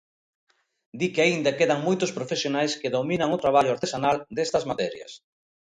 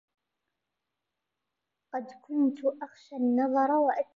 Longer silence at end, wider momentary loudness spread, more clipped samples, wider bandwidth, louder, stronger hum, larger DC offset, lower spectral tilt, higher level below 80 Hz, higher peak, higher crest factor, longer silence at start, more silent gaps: first, 0.6 s vs 0.1 s; second, 8 LU vs 14 LU; neither; first, 10.5 kHz vs 7.2 kHz; first, -24 LUFS vs -28 LUFS; neither; neither; second, -4.5 dB/octave vs -7 dB/octave; first, -62 dBFS vs -88 dBFS; first, -6 dBFS vs -14 dBFS; about the same, 18 dB vs 16 dB; second, 0.95 s vs 1.95 s; neither